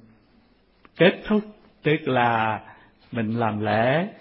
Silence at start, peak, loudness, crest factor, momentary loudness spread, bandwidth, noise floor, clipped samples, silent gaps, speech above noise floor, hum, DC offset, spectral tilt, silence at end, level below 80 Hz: 1 s; -4 dBFS; -23 LUFS; 20 dB; 9 LU; 5.8 kHz; -59 dBFS; under 0.1%; none; 38 dB; none; under 0.1%; -11 dB/octave; 0.05 s; -58 dBFS